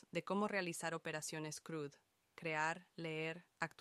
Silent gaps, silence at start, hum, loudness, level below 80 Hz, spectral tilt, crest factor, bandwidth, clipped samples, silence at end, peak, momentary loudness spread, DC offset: none; 0.15 s; none; -43 LUFS; -86 dBFS; -4 dB/octave; 22 dB; 14.5 kHz; under 0.1%; 0.1 s; -22 dBFS; 8 LU; under 0.1%